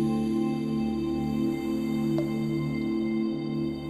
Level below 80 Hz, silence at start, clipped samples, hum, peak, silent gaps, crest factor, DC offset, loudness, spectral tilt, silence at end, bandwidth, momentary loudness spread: -50 dBFS; 0 s; under 0.1%; none; -16 dBFS; none; 12 dB; under 0.1%; -28 LUFS; -8 dB/octave; 0 s; 14 kHz; 2 LU